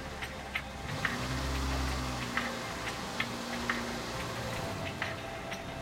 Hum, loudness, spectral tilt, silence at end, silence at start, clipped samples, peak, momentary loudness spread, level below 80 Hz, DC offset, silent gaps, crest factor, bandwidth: none; -36 LUFS; -4 dB/octave; 0 s; 0 s; under 0.1%; -16 dBFS; 6 LU; -44 dBFS; under 0.1%; none; 20 dB; 16 kHz